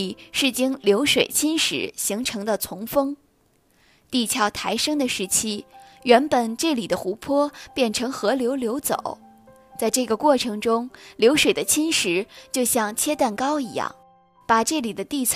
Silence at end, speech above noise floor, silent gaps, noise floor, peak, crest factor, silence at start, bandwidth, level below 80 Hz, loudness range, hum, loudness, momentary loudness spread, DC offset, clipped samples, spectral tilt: 0 s; 40 dB; none; -62 dBFS; -2 dBFS; 20 dB; 0 s; 15.5 kHz; -58 dBFS; 4 LU; none; -22 LUFS; 10 LU; under 0.1%; under 0.1%; -2.5 dB/octave